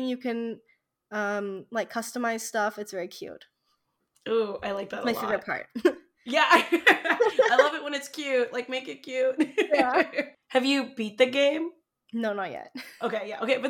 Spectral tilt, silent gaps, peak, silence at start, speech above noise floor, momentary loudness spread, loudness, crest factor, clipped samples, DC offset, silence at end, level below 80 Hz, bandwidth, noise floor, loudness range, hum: -3 dB/octave; none; -6 dBFS; 0 s; 48 dB; 15 LU; -26 LUFS; 22 dB; under 0.1%; under 0.1%; 0 s; -72 dBFS; 18 kHz; -75 dBFS; 9 LU; none